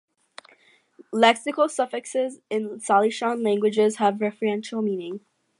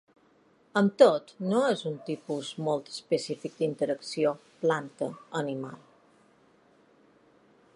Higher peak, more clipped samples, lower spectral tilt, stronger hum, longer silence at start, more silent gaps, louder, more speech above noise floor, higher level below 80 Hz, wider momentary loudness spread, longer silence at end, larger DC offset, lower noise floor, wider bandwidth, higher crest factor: about the same, -4 dBFS vs -6 dBFS; neither; second, -4 dB/octave vs -5.5 dB/octave; neither; first, 1.1 s vs 0.75 s; neither; first, -23 LUFS vs -29 LUFS; about the same, 36 dB vs 35 dB; about the same, -80 dBFS vs -82 dBFS; second, 10 LU vs 14 LU; second, 0.4 s vs 2 s; neither; second, -59 dBFS vs -63 dBFS; about the same, 11.5 kHz vs 11.5 kHz; about the same, 20 dB vs 24 dB